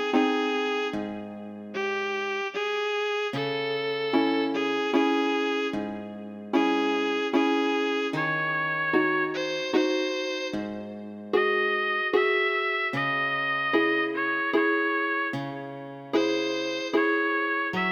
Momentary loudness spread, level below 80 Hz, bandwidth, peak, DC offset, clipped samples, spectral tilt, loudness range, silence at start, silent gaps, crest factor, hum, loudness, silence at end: 10 LU; -72 dBFS; 19.5 kHz; -10 dBFS; under 0.1%; under 0.1%; -4.5 dB/octave; 3 LU; 0 s; none; 18 dB; none; -26 LUFS; 0 s